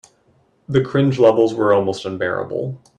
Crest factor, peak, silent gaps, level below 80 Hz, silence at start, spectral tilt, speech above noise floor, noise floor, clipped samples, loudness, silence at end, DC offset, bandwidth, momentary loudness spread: 18 dB; -2 dBFS; none; -56 dBFS; 0.7 s; -7.5 dB/octave; 41 dB; -58 dBFS; under 0.1%; -18 LUFS; 0.2 s; under 0.1%; 10 kHz; 10 LU